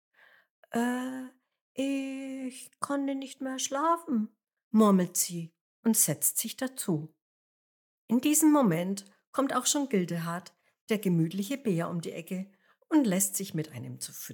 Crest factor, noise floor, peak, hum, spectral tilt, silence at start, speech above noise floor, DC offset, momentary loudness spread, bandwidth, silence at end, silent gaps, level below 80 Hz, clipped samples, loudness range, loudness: 20 dB; under -90 dBFS; -12 dBFS; none; -4.5 dB/octave; 0.7 s; over 61 dB; under 0.1%; 15 LU; 19.5 kHz; 0 s; 1.61-1.75 s, 4.64-4.71 s, 5.61-5.83 s, 7.22-8.08 s, 9.27-9.33 s, 10.81-10.87 s; under -90 dBFS; under 0.1%; 6 LU; -29 LUFS